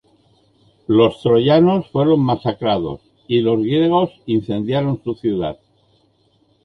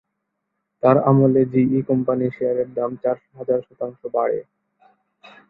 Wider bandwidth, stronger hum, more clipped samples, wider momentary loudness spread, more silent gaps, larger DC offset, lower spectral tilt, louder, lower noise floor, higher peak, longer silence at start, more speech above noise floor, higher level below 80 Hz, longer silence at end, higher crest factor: first, 5.8 kHz vs 4.1 kHz; neither; neither; about the same, 9 LU vs 11 LU; neither; neither; second, -9 dB/octave vs -12.5 dB/octave; first, -17 LUFS vs -20 LUFS; second, -59 dBFS vs -77 dBFS; about the same, -2 dBFS vs -2 dBFS; about the same, 0.9 s vs 0.85 s; second, 43 dB vs 58 dB; first, -50 dBFS vs -62 dBFS; about the same, 1.1 s vs 1.1 s; about the same, 16 dB vs 18 dB